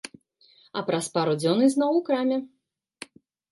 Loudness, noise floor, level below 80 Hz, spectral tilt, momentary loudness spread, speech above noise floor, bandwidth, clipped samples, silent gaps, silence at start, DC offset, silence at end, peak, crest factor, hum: -24 LUFS; -59 dBFS; -76 dBFS; -5.5 dB/octave; 23 LU; 36 dB; 11.5 kHz; under 0.1%; none; 0.75 s; under 0.1%; 1.05 s; -8 dBFS; 18 dB; none